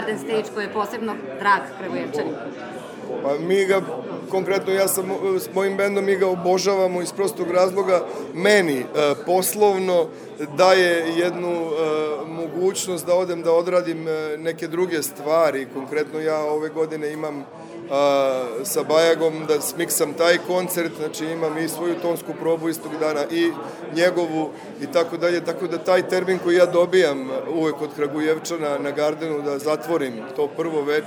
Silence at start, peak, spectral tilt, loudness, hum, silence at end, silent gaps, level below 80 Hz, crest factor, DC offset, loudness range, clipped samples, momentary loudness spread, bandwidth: 0 s; -2 dBFS; -4 dB/octave; -22 LUFS; none; 0 s; none; -76 dBFS; 20 dB; under 0.1%; 4 LU; under 0.1%; 10 LU; over 20 kHz